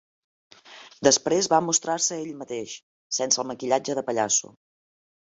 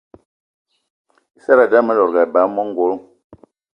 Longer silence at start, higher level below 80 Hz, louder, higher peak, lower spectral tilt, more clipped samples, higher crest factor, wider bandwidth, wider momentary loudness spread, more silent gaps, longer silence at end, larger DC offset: second, 0.7 s vs 1.5 s; second, -70 dBFS vs -64 dBFS; second, -24 LUFS vs -15 LUFS; second, -4 dBFS vs 0 dBFS; second, -2 dB/octave vs -7.5 dB/octave; neither; about the same, 22 dB vs 18 dB; first, 8.4 kHz vs 5.4 kHz; first, 13 LU vs 10 LU; first, 2.83-3.10 s vs 3.24-3.30 s; first, 0.9 s vs 0.4 s; neither